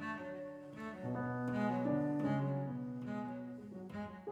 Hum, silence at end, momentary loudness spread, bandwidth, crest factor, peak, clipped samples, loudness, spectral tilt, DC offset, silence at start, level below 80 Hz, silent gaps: none; 0 s; 12 LU; 9.8 kHz; 16 dB; -24 dBFS; under 0.1%; -40 LUFS; -9 dB/octave; under 0.1%; 0 s; -74 dBFS; none